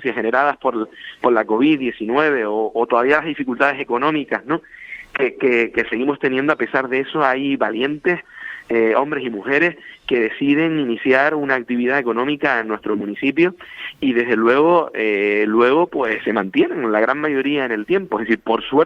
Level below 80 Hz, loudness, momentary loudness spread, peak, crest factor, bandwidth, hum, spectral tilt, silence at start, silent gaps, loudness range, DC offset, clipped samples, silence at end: -60 dBFS; -18 LUFS; 7 LU; 0 dBFS; 18 dB; 7.2 kHz; none; -7 dB/octave; 0 s; none; 3 LU; under 0.1%; under 0.1%; 0 s